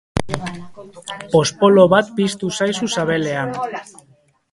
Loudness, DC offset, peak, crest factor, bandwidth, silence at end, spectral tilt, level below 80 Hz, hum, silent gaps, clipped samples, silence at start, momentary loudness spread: -17 LUFS; under 0.1%; 0 dBFS; 18 dB; 11.5 kHz; 0.7 s; -5 dB/octave; -46 dBFS; none; none; under 0.1%; 0.15 s; 20 LU